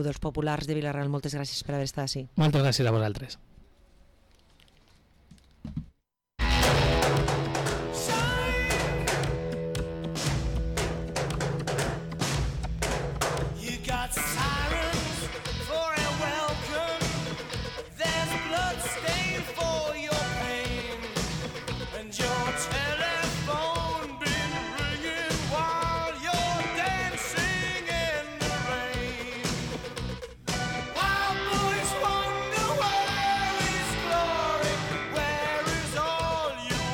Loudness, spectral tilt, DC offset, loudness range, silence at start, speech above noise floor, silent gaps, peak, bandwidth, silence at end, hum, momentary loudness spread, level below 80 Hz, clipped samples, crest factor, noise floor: -29 LUFS; -4 dB/octave; under 0.1%; 4 LU; 0 s; 40 dB; none; -16 dBFS; 19 kHz; 0 s; none; 7 LU; -40 dBFS; under 0.1%; 12 dB; -68 dBFS